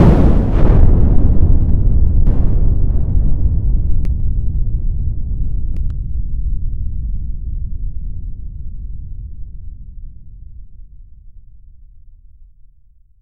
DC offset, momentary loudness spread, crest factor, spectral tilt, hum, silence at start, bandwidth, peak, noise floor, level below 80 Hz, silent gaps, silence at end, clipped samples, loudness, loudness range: under 0.1%; 20 LU; 14 dB; -11 dB/octave; none; 0 s; 3 kHz; 0 dBFS; -47 dBFS; -16 dBFS; none; 1.6 s; 0.1%; -18 LUFS; 20 LU